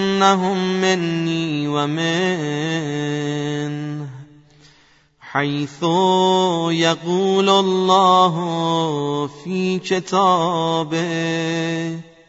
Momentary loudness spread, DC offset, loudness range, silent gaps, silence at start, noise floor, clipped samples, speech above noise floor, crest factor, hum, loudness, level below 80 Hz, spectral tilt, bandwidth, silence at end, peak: 9 LU; under 0.1%; 8 LU; none; 0 s; -54 dBFS; under 0.1%; 36 dB; 18 dB; none; -19 LUFS; -64 dBFS; -5 dB/octave; 8 kHz; 0.25 s; -2 dBFS